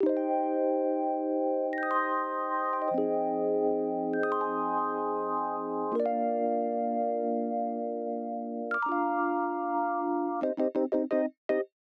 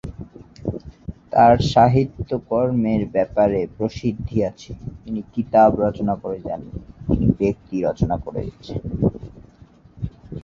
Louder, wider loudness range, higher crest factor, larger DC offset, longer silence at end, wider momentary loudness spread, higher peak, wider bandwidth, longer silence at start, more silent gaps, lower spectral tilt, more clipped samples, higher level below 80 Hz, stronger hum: second, -30 LUFS vs -20 LUFS; second, 2 LU vs 5 LU; about the same, 14 dB vs 18 dB; neither; first, 0.2 s vs 0.05 s; second, 4 LU vs 20 LU; second, -16 dBFS vs -2 dBFS; second, 5 kHz vs 7.6 kHz; about the same, 0 s vs 0.05 s; first, 11.37-11.49 s vs none; about the same, -8.5 dB/octave vs -8 dB/octave; neither; second, -82 dBFS vs -38 dBFS; neither